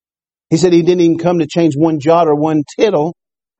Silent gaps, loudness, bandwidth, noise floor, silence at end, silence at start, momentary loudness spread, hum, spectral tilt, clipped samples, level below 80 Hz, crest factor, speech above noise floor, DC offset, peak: none; -13 LUFS; 8.4 kHz; under -90 dBFS; 0.5 s; 0.5 s; 6 LU; none; -7 dB/octave; under 0.1%; -54 dBFS; 12 dB; over 78 dB; under 0.1%; 0 dBFS